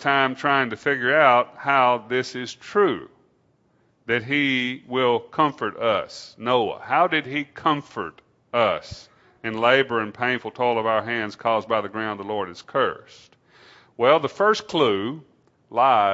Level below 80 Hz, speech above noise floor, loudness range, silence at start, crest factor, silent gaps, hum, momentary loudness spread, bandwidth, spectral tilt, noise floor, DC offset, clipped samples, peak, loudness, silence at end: -64 dBFS; 42 dB; 3 LU; 0 s; 22 dB; none; none; 12 LU; 8 kHz; -5 dB/octave; -64 dBFS; under 0.1%; under 0.1%; -2 dBFS; -22 LUFS; 0 s